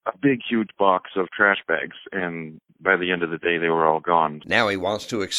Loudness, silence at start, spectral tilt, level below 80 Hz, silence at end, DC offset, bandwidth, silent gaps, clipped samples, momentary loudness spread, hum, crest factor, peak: -22 LUFS; 0.05 s; -4.5 dB/octave; -62 dBFS; 0 s; under 0.1%; 14 kHz; none; under 0.1%; 9 LU; none; 20 dB; -2 dBFS